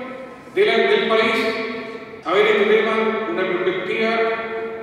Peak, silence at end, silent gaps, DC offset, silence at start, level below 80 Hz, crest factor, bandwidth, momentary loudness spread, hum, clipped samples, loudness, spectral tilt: -4 dBFS; 0 s; none; under 0.1%; 0 s; -64 dBFS; 16 dB; 11.5 kHz; 13 LU; none; under 0.1%; -19 LUFS; -5 dB/octave